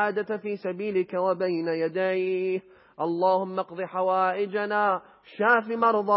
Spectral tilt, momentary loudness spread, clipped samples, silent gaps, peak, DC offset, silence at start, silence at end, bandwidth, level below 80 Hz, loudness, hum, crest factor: -10 dB/octave; 9 LU; under 0.1%; none; -8 dBFS; under 0.1%; 0 s; 0 s; 5.8 kHz; -80 dBFS; -26 LUFS; none; 18 dB